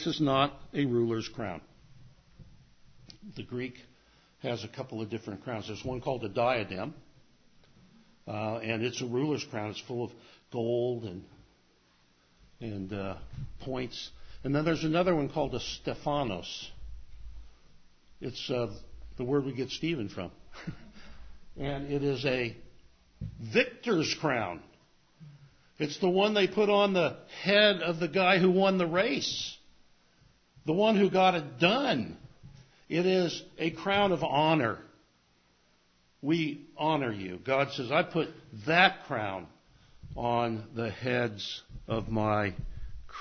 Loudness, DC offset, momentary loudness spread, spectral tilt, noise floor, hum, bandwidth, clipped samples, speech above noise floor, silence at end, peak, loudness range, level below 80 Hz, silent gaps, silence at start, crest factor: -30 LUFS; under 0.1%; 18 LU; -5.5 dB/octave; -67 dBFS; none; 6.6 kHz; under 0.1%; 37 dB; 0 s; -6 dBFS; 11 LU; -56 dBFS; none; 0 s; 26 dB